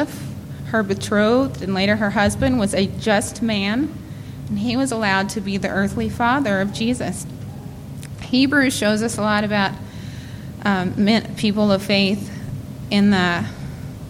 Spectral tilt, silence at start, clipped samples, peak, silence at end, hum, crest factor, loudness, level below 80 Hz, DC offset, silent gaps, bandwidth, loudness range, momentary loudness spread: -5 dB/octave; 0 s; under 0.1%; -4 dBFS; 0 s; none; 16 dB; -20 LUFS; -44 dBFS; under 0.1%; none; 15.5 kHz; 2 LU; 16 LU